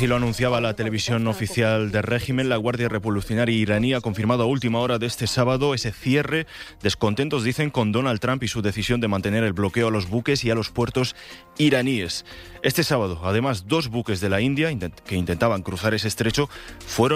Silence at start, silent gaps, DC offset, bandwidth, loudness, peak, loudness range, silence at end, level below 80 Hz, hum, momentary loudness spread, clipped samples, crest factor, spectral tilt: 0 s; none; under 0.1%; 16 kHz; -23 LUFS; -6 dBFS; 1 LU; 0 s; -46 dBFS; none; 5 LU; under 0.1%; 18 dB; -5.5 dB/octave